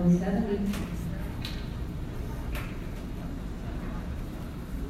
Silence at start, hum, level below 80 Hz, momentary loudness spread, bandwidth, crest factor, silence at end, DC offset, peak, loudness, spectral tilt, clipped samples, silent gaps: 0 s; none; -38 dBFS; 9 LU; 15 kHz; 18 dB; 0 s; under 0.1%; -14 dBFS; -34 LUFS; -7.5 dB/octave; under 0.1%; none